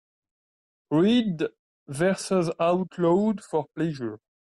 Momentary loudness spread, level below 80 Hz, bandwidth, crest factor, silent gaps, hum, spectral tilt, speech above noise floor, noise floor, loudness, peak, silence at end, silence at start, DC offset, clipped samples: 12 LU; -66 dBFS; 12 kHz; 14 dB; 1.59-1.86 s; none; -6.5 dB/octave; over 66 dB; under -90 dBFS; -25 LUFS; -12 dBFS; 0.4 s; 0.9 s; under 0.1%; under 0.1%